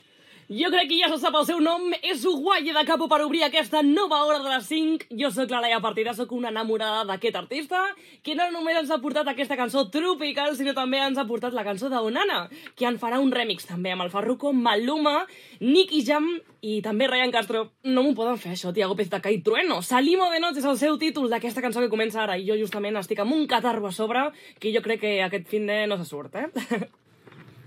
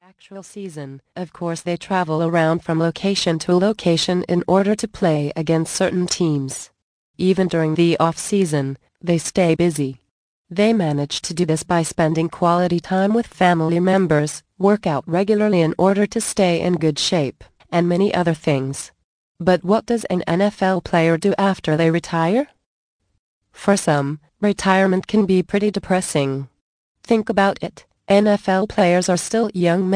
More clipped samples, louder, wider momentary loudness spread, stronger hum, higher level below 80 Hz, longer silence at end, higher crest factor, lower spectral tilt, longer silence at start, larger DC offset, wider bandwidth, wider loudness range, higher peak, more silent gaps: neither; second, -24 LUFS vs -19 LUFS; about the same, 8 LU vs 10 LU; neither; second, under -90 dBFS vs -52 dBFS; about the same, 0.05 s vs 0 s; about the same, 18 dB vs 16 dB; second, -4 dB/octave vs -5.5 dB/octave; first, 0.5 s vs 0.3 s; neither; first, 16.5 kHz vs 10.5 kHz; about the same, 4 LU vs 2 LU; second, -6 dBFS vs -2 dBFS; second, none vs 6.82-7.14 s, 10.11-10.45 s, 19.04-19.35 s, 22.66-23.00 s, 23.19-23.41 s, 26.61-26.95 s